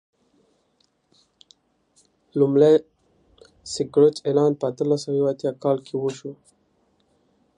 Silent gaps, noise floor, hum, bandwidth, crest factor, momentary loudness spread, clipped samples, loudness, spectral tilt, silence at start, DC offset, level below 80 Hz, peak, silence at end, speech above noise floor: none; -67 dBFS; none; 10.5 kHz; 20 dB; 15 LU; under 0.1%; -21 LUFS; -6.5 dB/octave; 2.35 s; under 0.1%; -68 dBFS; -4 dBFS; 1.25 s; 47 dB